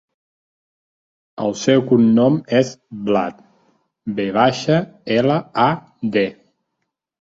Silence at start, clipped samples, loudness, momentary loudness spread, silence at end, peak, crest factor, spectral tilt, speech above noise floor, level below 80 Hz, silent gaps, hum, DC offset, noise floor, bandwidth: 1.4 s; under 0.1%; -18 LUFS; 11 LU; 0.9 s; -2 dBFS; 18 dB; -6 dB/octave; 59 dB; -58 dBFS; none; none; under 0.1%; -77 dBFS; 7.8 kHz